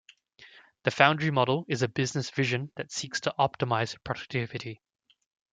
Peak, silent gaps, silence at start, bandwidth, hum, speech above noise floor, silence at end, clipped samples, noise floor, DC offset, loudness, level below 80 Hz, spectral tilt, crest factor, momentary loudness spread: -4 dBFS; none; 0.4 s; 9.4 kHz; none; 27 dB; 0.8 s; under 0.1%; -56 dBFS; under 0.1%; -28 LUFS; -66 dBFS; -4.5 dB/octave; 26 dB; 13 LU